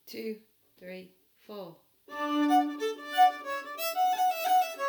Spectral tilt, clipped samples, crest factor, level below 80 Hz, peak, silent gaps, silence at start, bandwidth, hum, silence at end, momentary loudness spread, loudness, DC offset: -2.5 dB/octave; under 0.1%; 18 dB; -86 dBFS; -12 dBFS; none; 0.05 s; over 20 kHz; none; 0 s; 21 LU; -28 LUFS; under 0.1%